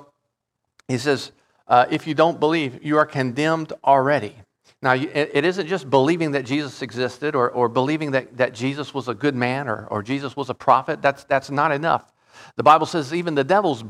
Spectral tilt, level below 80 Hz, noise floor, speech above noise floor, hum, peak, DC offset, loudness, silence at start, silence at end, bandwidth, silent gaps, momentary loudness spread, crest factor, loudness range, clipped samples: -6 dB/octave; -66 dBFS; -79 dBFS; 58 dB; none; -2 dBFS; under 0.1%; -21 LUFS; 0.9 s; 0 s; 13.5 kHz; none; 9 LU; 18 dB; 3 LU; under 0.1%